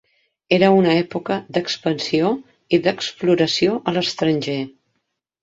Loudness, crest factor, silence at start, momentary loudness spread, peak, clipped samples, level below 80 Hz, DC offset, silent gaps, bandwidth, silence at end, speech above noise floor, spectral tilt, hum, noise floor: -19 LUFS; 18 dB; 0.5 s; 9 LU; -2 dBFS; under 0.1%; -60 dBFS; under 0.1%; none; 7.8 kHz; 0.75 s; 56 dB; -5.5 dB/octave; none; -74 dBFS